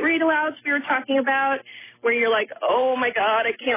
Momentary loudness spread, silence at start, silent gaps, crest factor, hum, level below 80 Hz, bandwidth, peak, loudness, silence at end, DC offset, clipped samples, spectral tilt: 5 LU; 0 s; none; 12 dB; none; -66 dBFS; 3.8 kHz; -10 dBFS; -21 LUFS; 0 s; under 0.1%; under 0.1%; -6.5 dB/octave